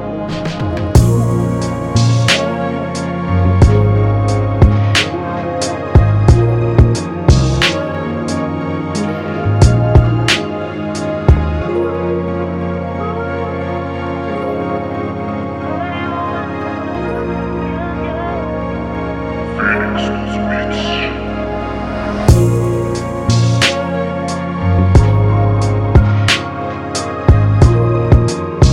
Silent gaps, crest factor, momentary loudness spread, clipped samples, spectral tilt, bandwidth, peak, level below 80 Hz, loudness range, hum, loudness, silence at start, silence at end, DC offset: none; 14 dB; 10 LU; under 0.1%; -6 dB/octave; 12.5 kHz; 0 dBFS; -22 dBFS; 7 LU; none; -15 LUFS; 0 s; 0 s; under 0.1%